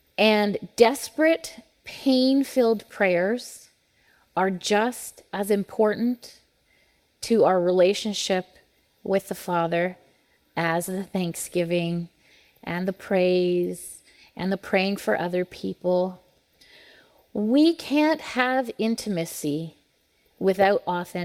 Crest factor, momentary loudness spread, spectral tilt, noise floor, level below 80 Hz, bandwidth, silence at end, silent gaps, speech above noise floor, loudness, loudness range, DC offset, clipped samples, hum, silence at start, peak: 22 dB; 14 LU; -5 dB/octave; -66 dBFS; -66 dBFS; 17 kHz; 0 s; none; 42 dB; -24 LUFS; 4 LU; under 0.1%; under 0.1%; none; 0.2 s; -4 dBFS